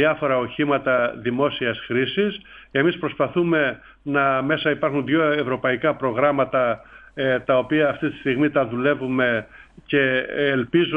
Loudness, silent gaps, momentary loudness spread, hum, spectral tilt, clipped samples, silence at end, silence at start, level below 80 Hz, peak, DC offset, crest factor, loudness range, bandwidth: -21 LUFS; none; 5 LU; none; -8.5 dB/octave; under 0.1%; 0 s; 0 s; -56 dBFS; -4 dBFS; under 0.1%; 16 dB; 1 LU; 5 kHz